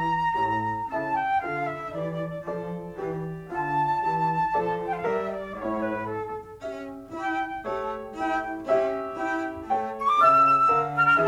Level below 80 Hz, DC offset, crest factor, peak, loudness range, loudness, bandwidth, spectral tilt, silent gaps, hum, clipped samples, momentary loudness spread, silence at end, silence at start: -56 dBFS; under 0.1%; 18 dB; -8 dBFS; 8 LU; -26 LUFS; 14 kHz; -6.5 dB/octave; none; none; under 0.1%; 13 LU; 0 s; 0 s